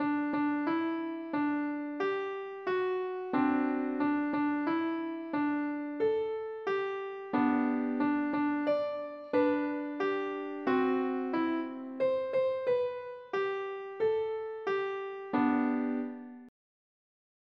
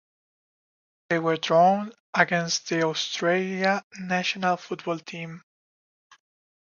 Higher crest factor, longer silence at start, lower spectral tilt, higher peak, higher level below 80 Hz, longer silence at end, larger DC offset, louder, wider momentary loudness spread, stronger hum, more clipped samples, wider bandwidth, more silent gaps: second, 16 dB vs 22 dB; second, 0 s vs 1.1 s; first, -7.5 dB/octave vs -4 dB/octave; second, -16 dBFS vs -4 dBFS; about the same, -76 dBFS vs -76 dBFS; second, 0.95 s vs 1.2 s; neither; second, -32 LUFS vs -25 LUFS; second, 7 LU vs 12 LU; neither; neither; second, 6 kHz vs 7.4 kHz; second, none vs 2.00-2.13 s, 3.84-3.91 s